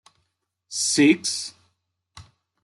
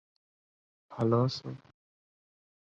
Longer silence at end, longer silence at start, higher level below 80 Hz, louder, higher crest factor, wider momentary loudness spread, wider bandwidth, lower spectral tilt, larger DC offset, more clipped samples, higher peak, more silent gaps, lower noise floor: second, 0.4 s vs 1.05 s; second, 0.7 s vs 0.9 s; about the same, -68 dBFS vs -70 dBFS; first, -21 LUFS vs -30 LUFS; about the same, 20 dB vs 22 dB; second, 15 LU vs 21 LU; first, 12 kHz vs 7.6 kHz; second, -2.5 dB/octave vs -8 dB/octave; neither; neither; first, -6 dBFS vs -14 dBFS; neither; second, -75 dBFS vs under -90 dBFS